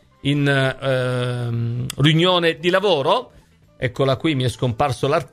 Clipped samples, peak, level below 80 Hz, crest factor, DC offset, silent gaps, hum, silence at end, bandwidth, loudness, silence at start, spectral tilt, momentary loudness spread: under 0.1%; 0 dBFS; -50 dBFS; 18 dB; under 0.1%; none; none; 0.05 s; 15 kHz; -19 LUFS; 0.25 s; -6 dB/octave; 8 LU